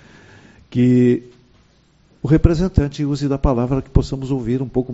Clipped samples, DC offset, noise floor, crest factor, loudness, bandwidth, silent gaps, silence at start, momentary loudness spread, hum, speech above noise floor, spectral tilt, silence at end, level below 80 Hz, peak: under 0.1%; under 0.1%; -55 dBFS; 18 dB; -18 LUFS; 8 kHz; none; 0.7 s; 8 LU; none; 38 dB; -8.5 dB/octave; 0 s; -28 dBFS; 0 dBFS